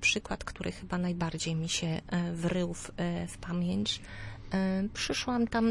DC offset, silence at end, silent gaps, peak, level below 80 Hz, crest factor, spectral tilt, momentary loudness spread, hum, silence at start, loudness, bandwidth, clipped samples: under 0.1%; 0 s; none; -16 dBFS; -50 dBFS; 16 dB; -4.5 dB/octave; 7 LU; none; 0 s; -33 LUFS; 11.5 kHz; under 0.1%